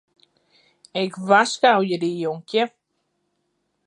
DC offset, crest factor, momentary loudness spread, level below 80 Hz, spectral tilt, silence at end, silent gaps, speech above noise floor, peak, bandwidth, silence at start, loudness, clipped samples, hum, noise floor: under 0.1%; 22 dB; 10 LU; -78 dBFS; -4 dB/octave; 1.2 s; none; 53 dB; -2 dBFS; 11 kHz; 0.95 s; -21 LUFS; under 0.1%; none; -73 dBFS